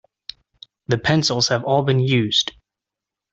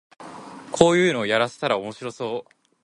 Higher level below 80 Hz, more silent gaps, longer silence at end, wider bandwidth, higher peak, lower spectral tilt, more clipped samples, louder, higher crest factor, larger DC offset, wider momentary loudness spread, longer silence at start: first, -54 dBFS vs -60 dBFS; neither; first, 0.8 s vs 0.45 s; second, 8 kHz vs 11.5 kHz; second, -4 dBFS vs 0 dBFS; about the same, -4.5 dB/octave vs -4.5 dB/octave; neither; first, -19 LUFS vs -22 LUFS; second, 18 dB vs 24 dB; neither; about the same, 21 LU vs 23 LU; first, 0.9 s vs 0.2 s